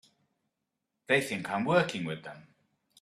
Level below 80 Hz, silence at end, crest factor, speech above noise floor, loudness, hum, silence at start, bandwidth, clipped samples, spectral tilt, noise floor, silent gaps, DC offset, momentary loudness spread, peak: -72 dBFS; 0.6 s; 22 dB; 55 dB; -29 LUFS; none; 1.1 s; 14.5 kHz; under 0.1%; -5 dB/octave; -85 dBFS; none; under 0.1%; 13 LU; -10 dBFS